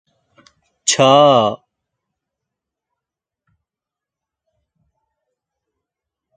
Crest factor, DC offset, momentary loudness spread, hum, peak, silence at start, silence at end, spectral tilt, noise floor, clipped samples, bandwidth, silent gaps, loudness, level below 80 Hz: 20 dB; under 0.1%; 11 LU; none; 0 dBFS; 0.85 s; 4.8 s; -3.5 dB/octave; -87 dBFS; under 0.1%; 9.6 kHz; none; -13 LUFS; -66 dBFS